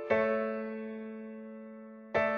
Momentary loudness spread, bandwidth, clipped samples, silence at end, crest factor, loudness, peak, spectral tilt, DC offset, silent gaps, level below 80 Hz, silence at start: 18 LU; 6.4 kHz; under 0.1%; 0 s; 18 dB; -35 LUFS; -16 dBFS; -7 dB/octave; under 0.1%; none; -70 dBFS; 0 s